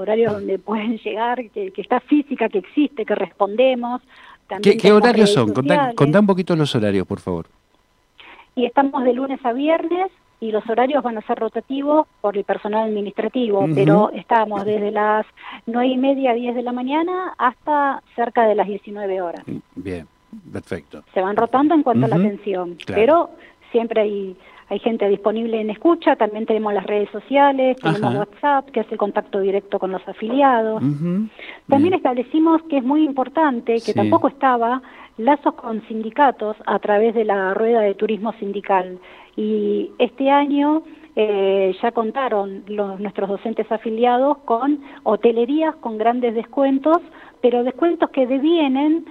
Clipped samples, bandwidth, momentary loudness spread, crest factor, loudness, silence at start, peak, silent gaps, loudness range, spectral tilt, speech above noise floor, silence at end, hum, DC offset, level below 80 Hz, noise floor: under 0.1%; 11 kHz; 11 LU; 16 dB; -19 LUFS; 0 s; -2 dBFS; none; 4 LU; -7 dB/octave; 41 dB; 0 s; none; under 0.1%; -62 dBFS; -60 dBFS